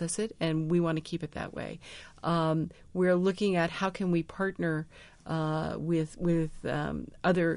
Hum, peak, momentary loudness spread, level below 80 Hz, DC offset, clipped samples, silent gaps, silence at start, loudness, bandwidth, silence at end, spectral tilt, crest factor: none; -14 dBFS; 10 LU; -54 dBFS; under 0.1%; under 0.1%; none; 0 s; -31 LUFS; 10.5 kHz; 0 s; -6.5 dB/octave; 16 dB